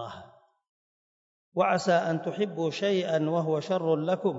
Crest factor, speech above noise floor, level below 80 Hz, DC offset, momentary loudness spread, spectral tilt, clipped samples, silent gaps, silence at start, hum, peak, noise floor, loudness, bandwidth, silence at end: 16 dB; 27 dB; -76 dBFS; under 0.1%; 7 LU; -6 dB/octave; under 0.1%; 0.69-1.52 s; 0 s; none; -12 dBFS; -54 dBFS; -27 LUFS; 8 kHz; 0 s